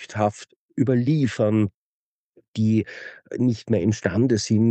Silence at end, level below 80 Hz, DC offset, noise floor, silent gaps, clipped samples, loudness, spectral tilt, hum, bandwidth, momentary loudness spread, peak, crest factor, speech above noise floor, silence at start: 0 s; -58 dBFS; under 0.1%; -61 dBFS; 0.56-0.69 s, 1.74-2.33 s, 2.48-2.54 s; under 0.1%; -22 LUFS; -7 dB/octave; none; 8.6 kHz; 14 LU; -6 dBFS; 18 dB; 40 dB; 0 s